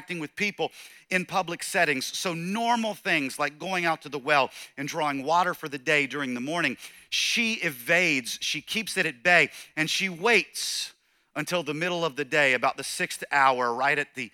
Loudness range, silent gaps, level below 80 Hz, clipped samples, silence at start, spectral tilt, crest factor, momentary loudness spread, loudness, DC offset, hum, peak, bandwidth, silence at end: 3 LU; none; -72 dBFS; under 0.1%; 0 s; -3 dB/octave; 22 dB; 9 LU; -25 LUFS; under 0.1%; none; -6 dBFS; 18.5 kHz; 0.05 s